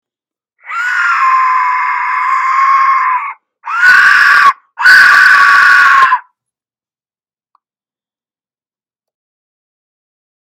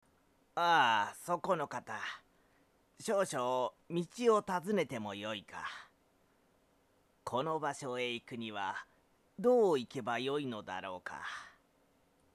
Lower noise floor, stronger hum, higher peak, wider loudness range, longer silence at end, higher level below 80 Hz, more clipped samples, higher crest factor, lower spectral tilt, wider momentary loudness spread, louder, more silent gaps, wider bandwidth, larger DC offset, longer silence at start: first, under -90 dBFS vs -72 dBFS; neither; first, 0 dBFS vs -16 dBFS; about the same, 6 LU vs 6 LU; first, 4.25 s vs 0.85 s; first, -58 dBFS vs -78 dBFS; first, 0.3% vs under 0.1%; second, 10 dB vs 20 dB; second, 1.5 dB/octave vs -4.5 dB/octave; about the same, 13 LU vs 15 LU; first, -7 LUFS vs -35 LUFS; neither; first, over 20 kHz vs 14 kHz; neither; about the same, 0.65 s vs 0.55 s